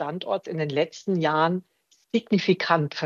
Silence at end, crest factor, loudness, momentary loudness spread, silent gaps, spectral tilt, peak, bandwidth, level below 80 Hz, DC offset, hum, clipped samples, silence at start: 0 s; 20 dB; -25 LUFS; 7 LU; none; -6.5 dB/octave; -4 dBFS; 7.4 kHz; -74 dBFS; under 0.1%; none; under 0.1%; 0 s